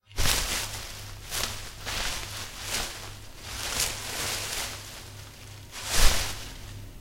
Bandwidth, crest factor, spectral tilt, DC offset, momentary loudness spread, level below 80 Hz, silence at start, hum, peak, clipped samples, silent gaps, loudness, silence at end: 16 kHz; 26 dB; -1.5 dB/octave; under 0.1%; 17 LU; -34 dBFS; 0.1 s; none; -4 dBFS; under 0.1%; none; -30 LUFS; 0 s